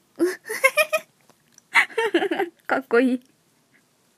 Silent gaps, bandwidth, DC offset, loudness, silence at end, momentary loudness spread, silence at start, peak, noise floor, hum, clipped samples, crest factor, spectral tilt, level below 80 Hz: none; 15.5 kHz; under 0.1%; -22 LUFS; 1 s; 8 LU; 0.2 s; -2 dBFS; -62 dBFS; none; under 0.1%; 22 dB; -2 dB/octave; -84 dBFS